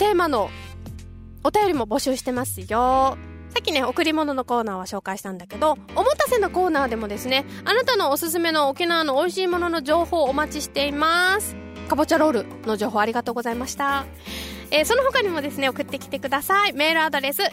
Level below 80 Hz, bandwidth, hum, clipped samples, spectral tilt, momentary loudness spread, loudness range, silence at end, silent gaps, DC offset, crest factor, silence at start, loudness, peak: -46 dBFS; 16 kHz; none; under 0.1%; -3.5 dB/octave; 11 LU; 2 LU; 0 s; none; under 0.1%; 16 dB; 0 s; -22 LUFS; -6 dBFS